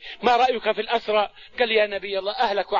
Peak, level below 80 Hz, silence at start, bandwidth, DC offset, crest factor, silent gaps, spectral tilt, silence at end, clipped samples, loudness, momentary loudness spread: -6 dBFS; -56 dBFS; 0 s; 7.4 kHz; 0.2%; 18 dB; none; -4 dB/octave; 0 s; under 0.1%; -22 LUFS; 7 LU